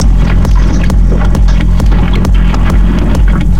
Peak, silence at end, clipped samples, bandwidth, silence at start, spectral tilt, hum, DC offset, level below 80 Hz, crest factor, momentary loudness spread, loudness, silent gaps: 0 dBFS; 0 s; 0.2%; 8.2 kHz; 0 s; -7 dB/octave; none; 20%; -8 dBFS; 8 dB; 1 LU; -10 LUFS; none